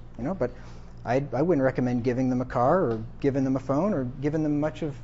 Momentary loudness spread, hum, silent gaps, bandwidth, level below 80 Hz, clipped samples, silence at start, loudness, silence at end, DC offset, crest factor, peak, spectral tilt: 8 LU; none; none; 7.6 kHz; -44 dBFS; under 0.1%; 0 s; -26 LUFS; 0 s; under 0.1%; 16 dB; -10 dBFS; -8.5 dB/octave